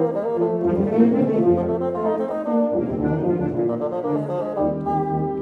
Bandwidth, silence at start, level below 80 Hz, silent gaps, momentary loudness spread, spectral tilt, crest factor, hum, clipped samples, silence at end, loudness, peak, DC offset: 4.5 kHz; 0 s; -48 dBFS; none; 6 LU; -10.5 dB/octave; 16 dB; none; under 0.1%; 0 s; -21 LUFS; -6 dBFS; under 0.1%